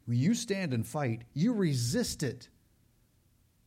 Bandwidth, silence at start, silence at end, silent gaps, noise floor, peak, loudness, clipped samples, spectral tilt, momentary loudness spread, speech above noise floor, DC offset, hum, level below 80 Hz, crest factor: 16.5 kHz; 0.05 s; 1.2 s; none; -68 dBFS; -18 dBFS; -31 LUFS; under 0.1%; -5.5 dB/octave; 7 LU; 37 dB; under 0.1%; none; -60 dBFS; 14 dB